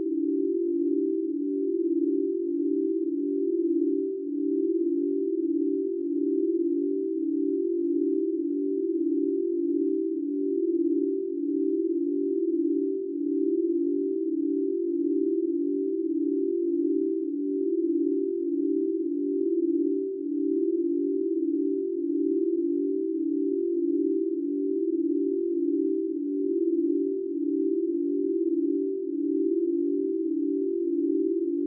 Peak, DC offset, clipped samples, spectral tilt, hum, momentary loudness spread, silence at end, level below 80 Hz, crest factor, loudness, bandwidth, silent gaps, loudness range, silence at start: -16 dBFS; under 0.1%; under 0.1%; -9 dB/octave; none; 3 LU; 0 s; under -90 dBFS; 10 dB; -27 LUFS; 0.5 kHz; none; 0 LU; 0 s